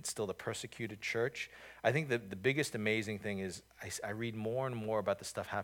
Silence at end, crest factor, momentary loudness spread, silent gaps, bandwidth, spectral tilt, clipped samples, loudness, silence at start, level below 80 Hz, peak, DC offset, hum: 0 s; 22 dB; 9 LU; none; 19 kHz; -4.5 dB/octave; under 0.1%; -37 LUFS; 0 s; -72 dBFS; -16 dBFS; under 0.1%; none